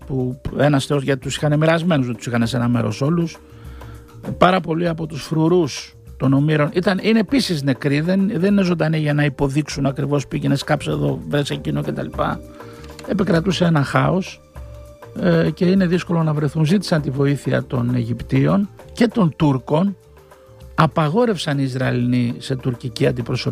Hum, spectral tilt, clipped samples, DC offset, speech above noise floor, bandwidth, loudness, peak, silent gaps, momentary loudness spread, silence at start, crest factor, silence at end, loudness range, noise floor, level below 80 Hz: none; -6.5 dB/octave; under 0.1%; under 0.1%; 27 dB; 15 kHz; -19 LUFS; -2 dBFS; none; 12 LU; 0 s; 18 dB; 0 s; 3 LU; -46 dBFS; -42 dBFS